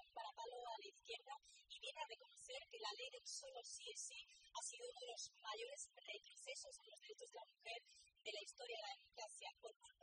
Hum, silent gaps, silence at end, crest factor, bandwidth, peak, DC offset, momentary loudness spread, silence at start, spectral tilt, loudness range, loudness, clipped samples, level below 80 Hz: none; 9.76-9.80 s; 0.1 s; 20 dB; 10 kHz; -36 dBFS; under 0.1%; 8 LU; 0 s; 2 dB/octave; 3 LU; -54 LUFS; under 0.1%; under -90 dBFS